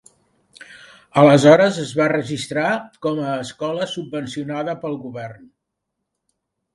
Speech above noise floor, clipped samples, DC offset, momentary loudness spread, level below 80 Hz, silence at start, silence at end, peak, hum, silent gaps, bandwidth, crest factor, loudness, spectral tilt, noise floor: 60 dB; under 0.1%; under 0.1%; 16 LU; -62 dBFS; 0.7 s; 1.4 s; 0 dBFS; none; none; 11.5 kHz; 20 dB; -18 LUFS; -6 dB/octave; -78 dBFS